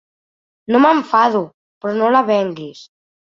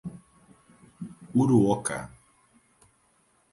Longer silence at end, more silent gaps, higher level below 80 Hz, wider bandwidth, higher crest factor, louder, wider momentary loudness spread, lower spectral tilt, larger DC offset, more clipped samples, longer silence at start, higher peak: second, 0.5 s vs 1.45 s; first, 1.54-1.81 s vs none; about the same, -64 dBFS vs -60 dBFS; second, 7.4 kHz vs 11.5 kHz; about the same, 16 dB vs 20 dB; first, -15 LUFS vs -25 LUFS; second, 19 LU vs 22 LU; about the same, -6.5 dB/octave vs -6.5 dB/octave; neither; neither; first, 0.7 s vs 0.05 s; first, -2 dBFS vs -10 dBFS